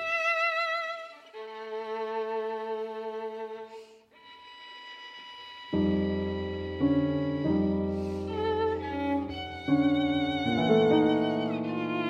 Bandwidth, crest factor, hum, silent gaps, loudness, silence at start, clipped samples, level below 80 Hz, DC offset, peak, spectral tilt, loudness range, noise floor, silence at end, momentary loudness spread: 7.8 kHz; 18 dB; none; none; -29 LUFS; 0 s; under 0.1%; -54 dBFS; under 0.1%; -12 dBFS; -7 dB/octave; 10 LU; -54 dBFS; 0 s; 18 LU